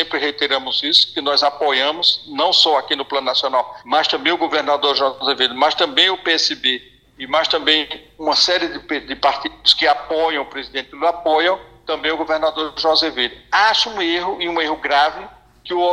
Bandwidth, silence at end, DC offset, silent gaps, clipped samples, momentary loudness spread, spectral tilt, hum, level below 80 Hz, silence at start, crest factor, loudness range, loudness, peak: 12 kHz; 0 s; under 0.1%; none; under 0.1%; 8 LU; -1.5 dB/octave; none; -54 dBFS; 0 s; 18 dB; 3 LU; -17 LUFS; 0 dBFS